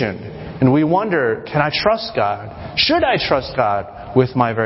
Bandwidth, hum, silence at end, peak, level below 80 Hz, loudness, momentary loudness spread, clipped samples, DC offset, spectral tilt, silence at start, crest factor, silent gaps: 5.8 kHz; none; 0 s; 0 dBFS; -42 dBFS; -17 LUFS; 9 LU; under 0.1%; under 0.1%; -9.5 dB/octave; 0 s; 18 dB; none